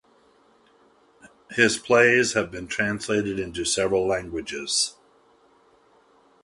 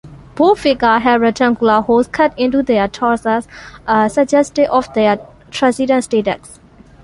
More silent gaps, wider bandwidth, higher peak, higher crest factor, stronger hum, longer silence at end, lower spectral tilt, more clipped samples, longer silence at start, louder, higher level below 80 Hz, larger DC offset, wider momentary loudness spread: neither; about the same, 11.5 kHz vs 11.5 kHz; about the same, -4 dBFS vs -2 dBFS; first, 22 dB vs 14 dB; neither; first, 1.5 s vs 0.5 s; second, -3 dB/octave vs -5 dB/octave; neither; first, 1.5 s vs 0.05 s; second, -23 LUFS vs -14 LUFS; second, -54 dBFS vs -44 dBFS; neither; about the same, 11 LU vs 9 LU